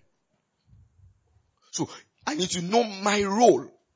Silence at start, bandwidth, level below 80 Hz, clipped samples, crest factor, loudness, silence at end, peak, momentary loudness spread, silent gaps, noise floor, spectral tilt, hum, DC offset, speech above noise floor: 1.75 s; 8 kHz; -62 dBFS; under 0.1%; 22 dB; -25 LUFS; 0.3 s; -6 dBFS; 15 LU; none; -74 dBFS; -4 dB/octave; none; under 0.1%; 50 dB